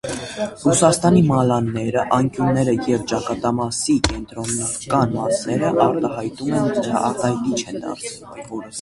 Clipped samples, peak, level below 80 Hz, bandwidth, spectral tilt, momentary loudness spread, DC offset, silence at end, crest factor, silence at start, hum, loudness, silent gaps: under 0.1%; 0 dBFS; -42 dBFS; 11.5 kHz; -5.5 dB/octave; 13 LU; under 0.1%; 0 s; 20 dB; 0.05 s; none; -20 LUFS; none